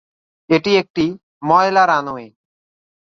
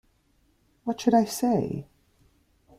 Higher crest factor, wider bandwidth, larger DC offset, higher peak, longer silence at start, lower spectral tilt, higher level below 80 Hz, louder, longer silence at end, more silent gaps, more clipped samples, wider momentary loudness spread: about the same, 18 dB vs 20 dB; second, 7.4 kHz vs 16 kHz; neither; first, 0 dBFS vs -8 dBFS; second, 0.5 s vs 0.85 s; about the same, -5.5 dB/octave vs -6 dB/octave; about the same, -58 dBFS vs -62 dBFS; first, -16 LUFS vs -26 LUFS; about the same, 0.85 s vs 0.95 s; first, 0.90-0.94 s, 1.23-1.41 s vs none; neither; about the same, 14 LU vs 13 LU